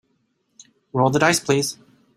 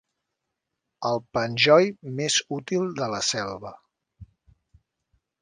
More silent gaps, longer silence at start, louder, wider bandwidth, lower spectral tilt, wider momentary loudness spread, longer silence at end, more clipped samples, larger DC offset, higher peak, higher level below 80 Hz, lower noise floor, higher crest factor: neither; about the same, 0.95 s vs 1 s; first, -20 LUFS vs -24 LUFS; first, 16 kHz vs 10 kHz; about the same, -4 dB/octave vs -3.5 dB/octave; about the same, 12 LU vs 14 LU; second, 0.45 s vs 1.15 s; neither; neither; about the same, -2 dBFS vs -4 dBFS; about the same, -60 dBFS vs -62 dBFS; second, -68 dBFS vs -82 dBFS; about the same, 20 dB vs 24 dB